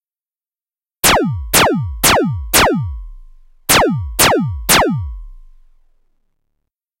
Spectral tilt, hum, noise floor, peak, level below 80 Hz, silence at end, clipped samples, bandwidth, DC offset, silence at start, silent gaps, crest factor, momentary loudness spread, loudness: -3 dB/octave; none; under -90 dBFS; 0 dBFS; -32 dBFS; 1.6 s; under 0.1%; 16.5 kHz; under 0.1%; 1.05 s; none; 16 dB; 12 LU; -13 LUFS